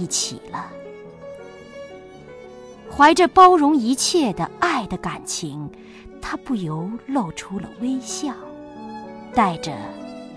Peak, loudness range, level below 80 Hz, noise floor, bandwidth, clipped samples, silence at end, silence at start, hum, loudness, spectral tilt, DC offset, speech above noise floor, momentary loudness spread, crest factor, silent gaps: -2 dBFS; 11 LU; -50 dBFS; -40 dBFS; 11 kHz; under 0.1%; 0 s; 0 s; none; -19 LUFS; -4 dB/octave; under 0.1%; 21 dB; 25 LU; 20 dB; none